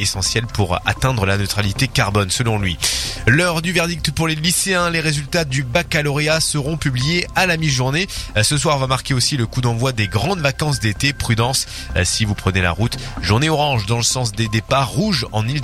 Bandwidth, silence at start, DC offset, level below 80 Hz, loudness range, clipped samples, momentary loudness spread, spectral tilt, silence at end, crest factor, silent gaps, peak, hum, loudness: 15.5 kHz; 0 s; under 0.1%; -34 dBFS; 1 LU; under 0.1%; 4 LU; -4 dB/octave; 0 s; 18 dB; none; 0 dBFS; none; -18 LUFS